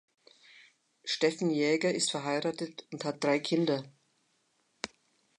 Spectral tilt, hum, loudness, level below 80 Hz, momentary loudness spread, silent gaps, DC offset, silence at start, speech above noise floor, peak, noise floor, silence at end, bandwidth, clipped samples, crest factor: -4 dB/octave; none; -31 LUFS; -80 dBFS; 14 LU; none; under 0.1%; 1.05 s; 44 dB; -14 dBFS; -74 dBFS; 1.5 s; 11 kHz; under 0.1%; 20 dB